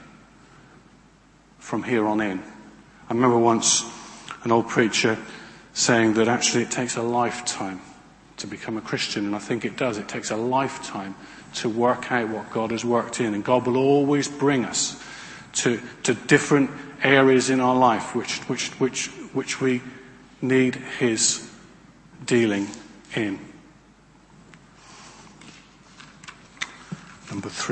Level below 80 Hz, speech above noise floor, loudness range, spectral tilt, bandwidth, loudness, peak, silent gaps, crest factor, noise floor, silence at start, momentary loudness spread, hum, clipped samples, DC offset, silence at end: -62 dBFS; 32 dB; 8 LU; -3.5 dB/octave; 8.8 kHz; -23 LUFS; -2 dBFS; none; 22 dB; -54 dBFS; 0 s; 18 LU; none; under 0.1%; under 0.1%; 0 s